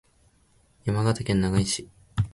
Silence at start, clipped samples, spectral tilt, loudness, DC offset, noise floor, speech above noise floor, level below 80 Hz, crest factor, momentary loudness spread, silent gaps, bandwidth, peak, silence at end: 0.85 s; under 0.1%; -5.5 dB/octave; -26 LUFS; under 0.1%; -62 dBFS; 38 dB; -44 dBFS; 18 dB; 9 LU; none; 11.5 kHz; -10 dBFS; 0.05 s